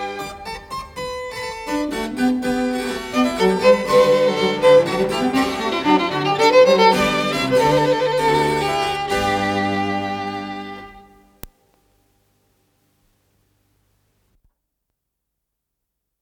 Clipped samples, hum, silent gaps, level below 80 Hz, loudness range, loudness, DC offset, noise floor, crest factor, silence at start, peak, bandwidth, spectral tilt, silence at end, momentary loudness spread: under 0.1%; none; none; -48 dBFS; 10 LU; -18 LUFS; under 0.1%; -79 dBFS; 18 dB; 0 s; -2 dBFS; 19 kHz; -5 dB/octave; 4.75 s; 15 LU